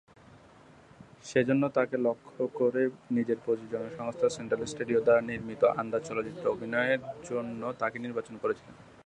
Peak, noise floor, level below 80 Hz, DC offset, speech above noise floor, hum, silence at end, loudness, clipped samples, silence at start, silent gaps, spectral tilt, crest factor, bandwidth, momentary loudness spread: -12 dBFS; -56 dBFS; -66 dBFS; under 0.1%; 26 dB; none; 0.25 s; -30 LUFS; under 0.1%; 0.3 s; none; -6 dB/octave; 20 dB; 10 kHz; 10 LU